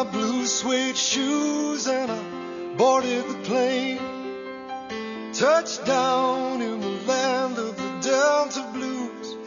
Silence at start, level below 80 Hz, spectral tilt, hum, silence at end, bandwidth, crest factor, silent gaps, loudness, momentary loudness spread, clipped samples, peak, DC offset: 0 s; -68 dBFS; -2.5 dB/octave; none; 0 s; 7.4 kHz; 16 dB; none; -24 LUFS; 12 LU; under 0.1%; -8 dBFS; under 0.1%